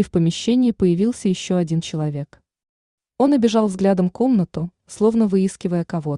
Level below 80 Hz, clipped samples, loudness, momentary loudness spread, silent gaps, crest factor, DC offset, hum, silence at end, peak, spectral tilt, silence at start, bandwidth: -52 dBFS; under 0.1%; -19 LUFS; 9 LU; 2.69-2.98 s; 14 dB; under 0.1%; none; 0 s; -4 dBFS; -7 dB/octave; 0 s; 11 kHz